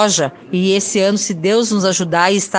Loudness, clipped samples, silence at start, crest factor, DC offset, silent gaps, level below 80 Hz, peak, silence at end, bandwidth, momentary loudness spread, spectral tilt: -15 LUFS; under 0.1%; 0 s; 14 dB; under 0.1%; none; -60 dBFS; 0 dBFS; 0 s; 10.5 kHz; 3 LU; -3.5 dB/octave